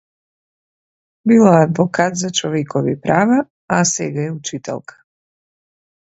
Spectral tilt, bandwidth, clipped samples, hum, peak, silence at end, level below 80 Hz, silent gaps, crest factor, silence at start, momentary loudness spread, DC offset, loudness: -5 dB/octave; 8.2 kHz; under 0.1%; none; 0 dBFS; 1.35 s; -60 dBFS; 3.50-3.68 s; 18 dB; 1.25 s; 14 LU; under 0.1%; -16 LUFS